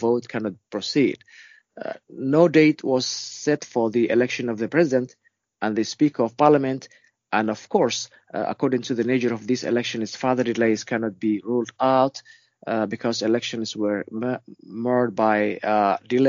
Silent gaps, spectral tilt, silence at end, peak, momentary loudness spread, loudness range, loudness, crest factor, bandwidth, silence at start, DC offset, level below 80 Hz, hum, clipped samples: none; -4.5 dB/octave; 0 s; -2 dBFS; 11 LU; 3 LU; -23 LUFS; 22 dB; 7.4 kHz; 0 s; under 0.1%; -70 dBFS; none; under 0.1%